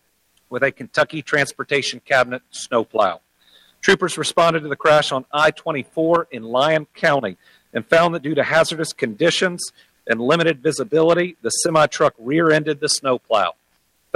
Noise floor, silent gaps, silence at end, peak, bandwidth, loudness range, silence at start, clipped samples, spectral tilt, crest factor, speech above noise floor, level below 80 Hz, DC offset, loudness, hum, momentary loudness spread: -64 dBFS; none; 0.65 s; -2 dBFS; 13.5 kHz; 2 LU; 0.5 s; under 0.1%; -3.5 dB/octave; 18 dB; 45 dB; -60 dBFS; under 0.1%; -19 LUFS; none; 8 LU